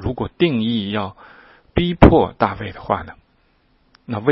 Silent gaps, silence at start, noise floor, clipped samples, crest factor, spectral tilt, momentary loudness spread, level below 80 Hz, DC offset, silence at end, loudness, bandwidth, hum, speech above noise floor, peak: none; 0 s; -59 dBFS; under 0.1%; 18 dB; -9 dB/octave; 17 LU; -30 dBFS; under 0.1%; 0 s; -18 LUFS; 6.6 kHz; none; 42 dB; 0 dBFS